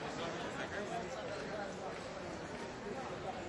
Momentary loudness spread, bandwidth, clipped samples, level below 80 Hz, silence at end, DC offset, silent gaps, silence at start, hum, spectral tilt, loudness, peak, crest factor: 3 LU; 11.5 kHz; under 0.1%; -64 dBFS; 0 s; under 0.1%; none; 0 s; none; -4.5 dB/octave; -43 LUFS; -28 dBFS; 14 dB